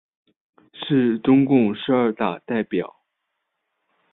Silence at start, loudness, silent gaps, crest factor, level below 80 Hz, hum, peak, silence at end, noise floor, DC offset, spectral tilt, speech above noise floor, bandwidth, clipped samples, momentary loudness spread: 0.75 s; -20 LUFS; none; 18 dB; -62 dBFS; none; -4 dBFS; 1.25 s; -77 dBFS; under 0.1%; -11.5 dB/octave; 58 dB; 4 kHz; under 0.1%; 11 LU